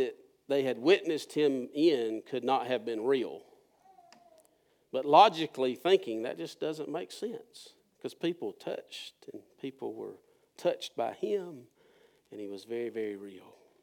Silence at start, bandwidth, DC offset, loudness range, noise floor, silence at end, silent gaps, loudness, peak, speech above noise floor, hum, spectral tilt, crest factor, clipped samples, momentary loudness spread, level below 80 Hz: 0 s; 17 kHz; under 0.1%; 10 LU; -69 dBFS; 0.45 s; none; -31 LUFS; -8 dBFS; 38 dB; none; -5 dB/octave; 24 dB; under 0.1%; 19 LU; under -90 dBFS